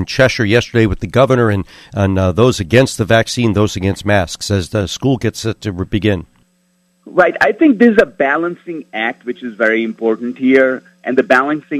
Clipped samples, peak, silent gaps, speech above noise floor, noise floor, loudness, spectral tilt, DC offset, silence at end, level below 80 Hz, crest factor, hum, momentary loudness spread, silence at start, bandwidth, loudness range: 0.1%; 0 dBFS; none; 45 dB; -59 dBFS; -14 LUFS; -6 dB/octave; under 0.1%; 0 s; -38 dBFS; 14 dB; none; 10 LU; 0 s; 14 kHz; 4 LU